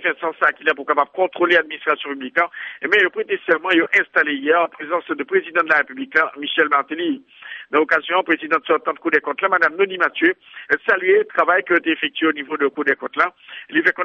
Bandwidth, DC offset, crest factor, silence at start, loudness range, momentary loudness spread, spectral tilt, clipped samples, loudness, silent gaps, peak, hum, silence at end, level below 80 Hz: 7.4 kHz; under 0.1%; 16 dB; 0 s; 2 LU; 7 LU; -5 dB/octave; under 0.1%; -18 LUFS; none; -2 dBFS; none; 0 s; -68 dBFS